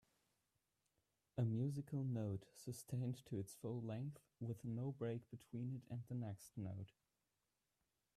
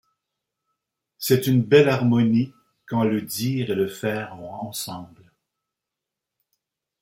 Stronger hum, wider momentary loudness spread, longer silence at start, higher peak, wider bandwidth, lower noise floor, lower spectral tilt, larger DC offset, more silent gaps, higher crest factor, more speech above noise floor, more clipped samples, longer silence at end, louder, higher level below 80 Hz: neither; second, 9 LU vs 15 LU; first, 1.35 s vs 1.2 s; second, -32 dBFS vs -4 dBFS; second, 14 kHz vs 16.5 kHz; first, -90 dBFS vs -85 dBFS; first, -8 dB/octave vs -6 dB/octave; neither; neither; about the same, 16 dB vs 20 dB; second, 43 dB vs 64 dB; neither; second, 1.3 s vs 1.95 s; second, -48 LUFS vs -22 LUFS; second, -80 dBFS vs -64 dBFS